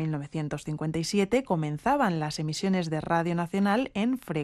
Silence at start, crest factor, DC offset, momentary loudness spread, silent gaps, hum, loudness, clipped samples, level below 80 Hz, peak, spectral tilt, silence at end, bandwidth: 0 s; 16 dB; under 0.1%; 7 LU; none; none; -28 LUFS; under 0.1%; -56 dBFS; -12 dBFS; -6 dB/octave; 0 s; 13 kHz